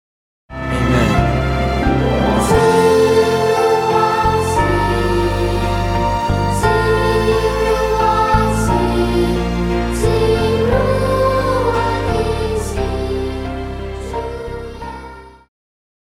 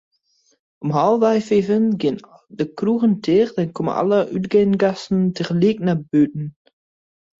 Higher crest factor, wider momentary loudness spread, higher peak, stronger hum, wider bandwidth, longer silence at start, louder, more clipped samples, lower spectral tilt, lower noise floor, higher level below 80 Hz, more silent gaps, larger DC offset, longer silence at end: about the same, 14 dB vs 16 dB; first, 12 LU vs 8 LU; about the same, -2 dBFS vs -4 dBFS; neither; first, 16.5 kHz vs 7.8 kHz; second, 0.5 s vs 0.8 s; first, -16 LUFS vs -19 LUFS; neither; second, -6 dB/octave vs -8 dB/octave; second, -35 dBFS vs -63 dBFS; first, -24 dBFS vs -58 dBFS; neither; neither; second, 0.75 s vs 0.9 s